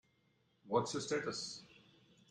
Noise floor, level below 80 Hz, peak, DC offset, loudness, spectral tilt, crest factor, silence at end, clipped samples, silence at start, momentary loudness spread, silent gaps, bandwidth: -76 dBFS; -78 dBFS; -20 dBFS; under 0.1%; -39 LUFS; -3.5 dB/octave; 24 dB; 0.55 s; under 0.1%; 0.65 s; 10 LU; none; 11 kHz